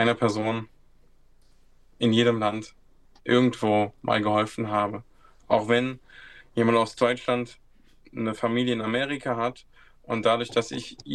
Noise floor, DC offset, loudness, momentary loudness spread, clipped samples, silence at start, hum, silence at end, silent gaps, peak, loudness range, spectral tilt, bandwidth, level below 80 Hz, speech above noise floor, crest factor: -55 dBFS; under 0.1%; -25 LUFS; 13 LU; under 0.1%; 0 s; none; 0 s; none; -6 dBFS; 3 LU; -5.5 dB/octave; 10.5 kHz; -58 dBFS; 30 dB; 20 dB